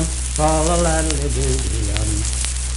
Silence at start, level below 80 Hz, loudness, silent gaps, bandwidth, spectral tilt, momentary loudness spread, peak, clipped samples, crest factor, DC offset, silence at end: 0 s; -22 dBFS; -19 LUFS; none; 11.5 kHz; -4 dB/octave; 4 LU; 0 dBFS; under 0.1%; 18 dB; under 0.1%; 0 s